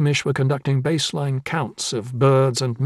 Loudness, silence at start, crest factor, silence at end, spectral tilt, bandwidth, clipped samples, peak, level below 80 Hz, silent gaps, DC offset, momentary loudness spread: -21 LUFS; 0 s; 14 dB; 0 s; -5.5 dB/octave; 12.5 kHz; under 0.1%; -6 dBFS; -60 dBFS; none; under 0.1%; 8 LU